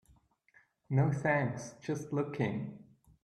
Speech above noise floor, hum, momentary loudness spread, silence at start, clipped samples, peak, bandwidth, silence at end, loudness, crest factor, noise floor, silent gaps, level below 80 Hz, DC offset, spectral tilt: 35 dB; none; 11 LU; 0.9 s; under 0.1%; -16 dBFS; 10.5 kHz; 0.4 s; -34 LUFS; 20 dB; -68 dBFS; none; -70 dBFS; under 0.1%; -7.5 dB/octave